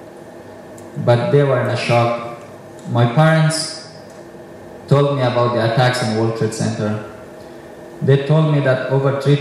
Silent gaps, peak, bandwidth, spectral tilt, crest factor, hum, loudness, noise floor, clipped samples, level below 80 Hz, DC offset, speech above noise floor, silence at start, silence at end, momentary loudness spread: none; -2 dBFS; 12.5 kHz; -6.5 dB/octave; 16 dB; none; -16 LUFS; -36 dBFS; under 0.1%; -58 dBFS; under 0.1%; 21 dB; 0 s; 0 s; 22 LU